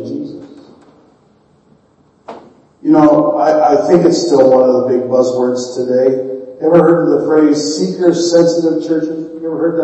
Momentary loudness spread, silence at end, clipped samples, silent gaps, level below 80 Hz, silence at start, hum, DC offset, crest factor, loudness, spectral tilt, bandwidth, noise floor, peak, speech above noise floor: 13 LU; 0 s; under 0.1%; none; -58 dBFS; 0 s; none; under 0.1%; 12 dB; -12 LUFS; -6 dB/octave; 8.4 kHz; -51 dBFS; 0 dBFS; 41 dB